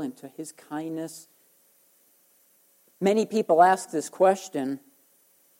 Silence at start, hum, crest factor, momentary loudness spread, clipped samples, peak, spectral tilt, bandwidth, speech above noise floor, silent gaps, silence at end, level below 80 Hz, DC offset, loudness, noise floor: 0 s; none; 22 dB; 20 LU; under 0.1%; -6 dBFS; -5 dB/octave; 16.5 kHz; 38 dB; none; 0.8 s; -80 dBFS; under 0.1%; -25 LUFS; -63 dBFS